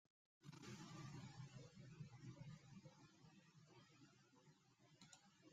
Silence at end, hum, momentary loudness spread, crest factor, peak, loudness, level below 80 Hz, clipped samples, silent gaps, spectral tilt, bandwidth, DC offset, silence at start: 0 s; none; 11 LU; 16 dB; -46 dBFS; -62 LUFS; -86 dBFS; under 0.1%; none; -5 dB/octave; 12.5 kHz; under 0.1%; 0.4 s